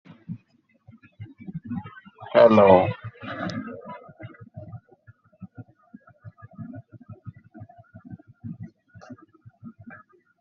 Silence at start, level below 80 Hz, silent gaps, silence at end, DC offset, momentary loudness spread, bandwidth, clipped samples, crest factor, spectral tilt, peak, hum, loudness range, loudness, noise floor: 0.3 s; -66 dBFS; none; 0.5 s; under 0.1%; 30 LU; 6.4 kHz; under 0.1%; 26 dB; -6 dB/octave; -2 dBFS; none; 23 LU; -20 LUFS; -64 dBFS